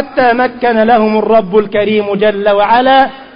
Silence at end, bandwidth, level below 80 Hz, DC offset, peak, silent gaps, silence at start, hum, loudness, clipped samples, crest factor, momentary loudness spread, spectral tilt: 0 s; 5.4 kHz; -44 dBFS; 1%; 0 dBFS; none; 0 s; none; -10 LUFS; under 0.1%; 10 dB; 4 LU; -8.5 dB/octave